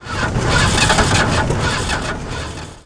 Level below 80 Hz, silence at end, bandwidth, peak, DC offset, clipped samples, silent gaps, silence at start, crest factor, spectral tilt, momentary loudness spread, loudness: -26 dBFS; 0.05 s; 10.5 kHz; 0 dBFS; under 0.1%; under 0.1%; none; 0 s; 16 dB; -4 dB/octave; 13 LU; -16 LUFS